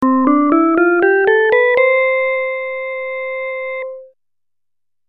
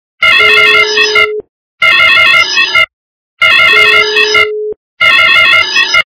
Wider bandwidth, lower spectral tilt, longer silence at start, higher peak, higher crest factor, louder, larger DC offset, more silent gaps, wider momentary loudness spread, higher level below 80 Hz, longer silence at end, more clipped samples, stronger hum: second, 4.5 kHz vs 5.4 kHz; first, -7 dB/octave vs -0.5 dB/octave; second, 0 s vs 0.2 s; about the same, 0 dBFS vs 0 dBFS; first, 16 dB vs 8 dB; second, -14 LUFS vs -5 LUFS; neither; second, none vs 1.49-1.78 s, 2.93-3.37 s, 4.76-4.97 s; first, 11 LU vs 8 LU; second, -60 dBFS vs -48 dBFS; first, 1.05 s vs 0.1 s; second, under 0.1% vs 3%; neither